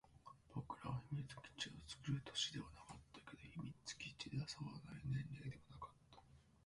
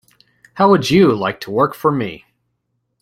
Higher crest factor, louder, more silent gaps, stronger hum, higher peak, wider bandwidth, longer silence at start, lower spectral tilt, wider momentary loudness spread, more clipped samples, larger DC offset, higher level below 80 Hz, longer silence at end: about the same, 20 dB vs 16 dB; second, -50 LUFS vs -15 LUFS; neither; neither; second, -30 dBFS vs -2 dBFS; second, 11.5 kHz vs 16 kHz; second, 0.05 s vs 0.55 s; second, -4 dB/octave vs -6.5 dB/octave; first, 15 LU vs 9 LU; neither; neither; second, -70 dBFS vs -52 dBFS; second, 0.15 s vs 0.85 s